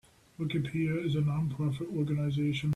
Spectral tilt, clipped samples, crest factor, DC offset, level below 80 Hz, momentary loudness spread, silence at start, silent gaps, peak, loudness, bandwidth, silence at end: -8 dB/octave; under 0.1%; 10 dB; under 0.1%; -60 dBFS; 4 LU; 0.4 s; none; -22 dBFS; -32 LUFS; 11.5 kHz; 0 s